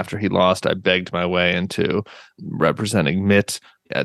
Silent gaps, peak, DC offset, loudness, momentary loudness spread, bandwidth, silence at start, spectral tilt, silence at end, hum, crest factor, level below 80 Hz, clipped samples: none; -2 dBFS; under 0.1%; -20 LUFS; 11 LU; 12.5 kHz; 0 s; -5 dB/octave; 0 s; none; 18 dB; -52 dBFS; under 0.1%